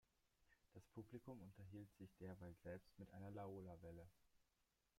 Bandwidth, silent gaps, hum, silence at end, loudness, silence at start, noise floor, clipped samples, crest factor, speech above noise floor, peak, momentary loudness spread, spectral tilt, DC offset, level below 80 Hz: 16 kHz; none; none; 0.55 s; -60 LUFS; 0.4 s; -88 dBFS; under 0.1%; 16 dB; 29 dB; -44 dBFS; 7 LU; -8 dB/octave; under 0.1%; -80 dBFS